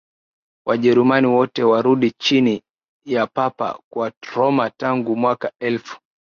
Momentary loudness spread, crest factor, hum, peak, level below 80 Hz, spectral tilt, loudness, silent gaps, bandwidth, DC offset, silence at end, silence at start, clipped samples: 11 LU; 16 dB; none; -4 dBFS; -64 dBFS; -6 dB/octave; -19 LUFS; 2.88-3.00 s, 3.84-3.91 s, 4.17-4.21 s; 7 kHz; under 0.1%; 0.25 s; 0.65 s; under 0.1%